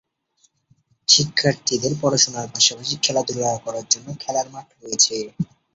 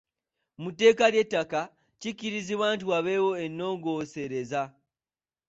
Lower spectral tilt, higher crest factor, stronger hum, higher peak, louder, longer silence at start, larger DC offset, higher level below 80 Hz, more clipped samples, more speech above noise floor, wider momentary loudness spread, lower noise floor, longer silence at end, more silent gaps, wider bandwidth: second, -2 dB/octave vs -4.5 dB/octave; about the same, 22 dB vs 20 dB; neither; first, 0 dBFS vs -8 dBFS; first, -19 LUFS vs -27 LUFS; first, 1.1 s vs 0.6 s; neither; first, -60 dBFS vs -70 dBFS; neither; second, 43 dB vs over 63 dB; second, 13 LU vs 16 LU; second, -64 dBFS vs under -90 dBFS; second, 0.3 s vs 0.8 s; neither; about the same, 8.2 kHz vs 8 kHz